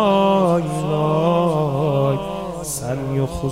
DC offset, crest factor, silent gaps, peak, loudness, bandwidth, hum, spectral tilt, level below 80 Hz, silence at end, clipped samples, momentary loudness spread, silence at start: 0.2%; 14 dB; none; -4 dBFS; -19 LUFS; 16 kHz; none; -6.5 dB/octave; -42 dBFS; 0 s; under 0.1%; 10 LU; 0 s